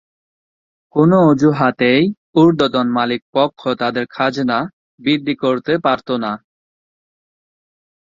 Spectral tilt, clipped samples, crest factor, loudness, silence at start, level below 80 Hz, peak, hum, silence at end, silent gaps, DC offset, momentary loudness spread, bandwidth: -7 dB/octave; under 0.1%; 16 dB; -16 LUFS; 0.95 s; -56 dBFS; 0 dBFS; none; 1.75 s; 2.17-2.33 s, 3.22-3.33 s, 4.73-4.98 s; under 0.1%; 9 LU; 7.6 kHz